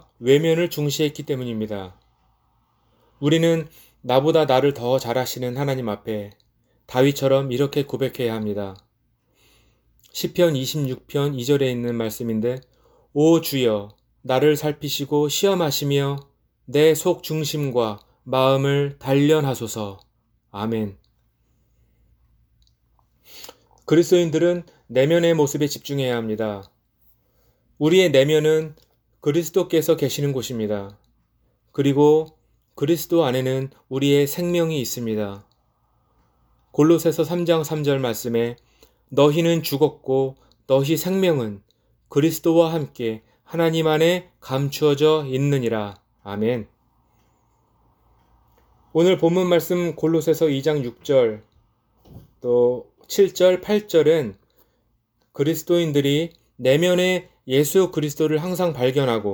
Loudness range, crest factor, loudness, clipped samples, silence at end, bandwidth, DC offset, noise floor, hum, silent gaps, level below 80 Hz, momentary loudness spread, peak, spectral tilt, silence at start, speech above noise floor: 4 LU; 20 dB; -21 LUFS; under 0.1%; 0 s; over 20 kHz; under 0.1%; -67 dBFS; none; none; -60 dBFS; 12 LU; -2 dBFS; -5.5 dB/octave; 0.2 s; 47 dB